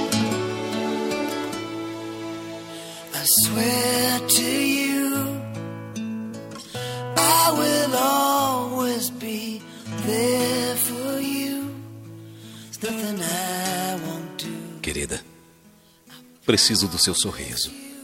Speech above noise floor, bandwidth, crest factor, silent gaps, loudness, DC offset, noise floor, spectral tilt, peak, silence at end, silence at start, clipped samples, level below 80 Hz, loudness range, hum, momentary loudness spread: 33 dB; 16.5 kHz; 20 dB; none; -22 LUFS; under 0.1%; -54 dBFS; -3 dB/octave; -4 dBFS; 0 s; 0 s; under 0.1%; -54 dBFS; 8 LU; none; 17 LU